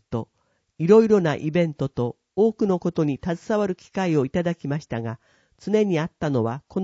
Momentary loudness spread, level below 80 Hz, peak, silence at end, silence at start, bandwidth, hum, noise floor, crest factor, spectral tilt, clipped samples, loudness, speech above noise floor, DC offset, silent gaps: 13 LU; -56 dBFS; -4 dBFS; 0 s; 0.1 s; 7.8 kHz; none; -70 dBFS; 20 dB; -7.5 dB/octave; under 0.1%; -23 LUFS; 48 dB; under 0.1%; none